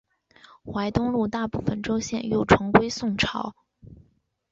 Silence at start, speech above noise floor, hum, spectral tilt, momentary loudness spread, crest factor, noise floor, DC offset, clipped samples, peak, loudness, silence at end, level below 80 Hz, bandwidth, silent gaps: 0.65 s; 41 dB; none; -5.5 dB/octave; 13 LU; 24 dB; -65 dBFS; under 0.1%; under 0.1%; -2 dBFS; -24 LUFS; 0.55 s; -46 dBFS; 7.8 kHz; none